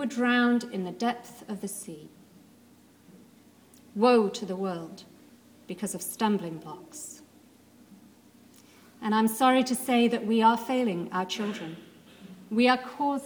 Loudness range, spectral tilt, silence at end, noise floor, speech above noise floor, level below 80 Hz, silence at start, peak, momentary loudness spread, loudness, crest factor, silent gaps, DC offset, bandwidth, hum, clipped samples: 9 LU; -4.5 dB/octave; 0 s; -57 dBFS; 30 dB; -76 dBFS; 0 s; -8 dBFS; 20 LU; -27 LUFS; 20 dB; none; under 0.1%; 19.5 kHz; none; under 0.1%